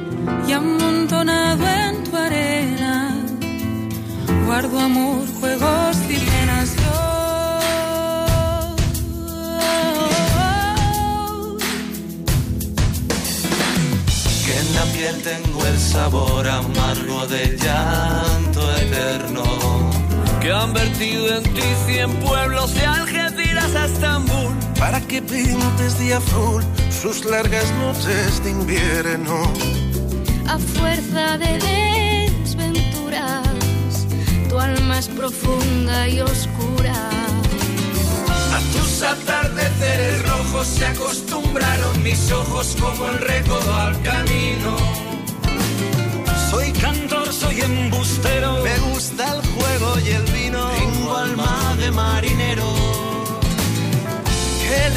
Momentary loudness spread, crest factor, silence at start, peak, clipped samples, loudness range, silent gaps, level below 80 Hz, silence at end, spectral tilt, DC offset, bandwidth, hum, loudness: 4 LU; 12 dB; 0 s; -6 dBFS; under 0.1%; 2 LU; none; -26 dBFS; 0 s; -4.5 dB/octave; under 0.1%; 15.5 kHz; none; -19 LUFS